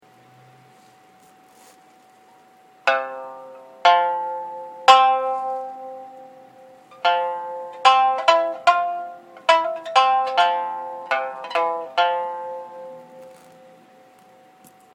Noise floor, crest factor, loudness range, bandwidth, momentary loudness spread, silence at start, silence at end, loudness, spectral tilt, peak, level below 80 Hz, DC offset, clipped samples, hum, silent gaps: -52 dBFS; 22 dB; 9 LU; 12.5 kHz; 21 LU; 2.85 s; 1.6 s; -20 LUFS; -1 dB/octave; 0 dBFS; -76 dBFS; under 0.1%; under 0.1%; none; none